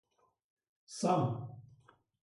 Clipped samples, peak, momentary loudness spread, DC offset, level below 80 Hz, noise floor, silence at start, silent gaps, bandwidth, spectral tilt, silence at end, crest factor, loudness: under 0.1%; -18 dBFS; 19 LU; under 0.1%; -74 dBFS; -66 dBFS; 0.9 s; none; 11.5 kHz; -6.5 dB/octave; 0.6 s; 20 dB; -34 LUFS